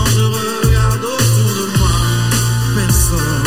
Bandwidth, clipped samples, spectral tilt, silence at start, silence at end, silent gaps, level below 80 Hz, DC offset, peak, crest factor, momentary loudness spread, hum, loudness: 17 kHz; under 0.1%; -4.5 dB/octave; 0 s; 0 s; none; -22 dBFS; 2%; 0 dBFS; 12 dB; 2 LU; none; -14 LUFS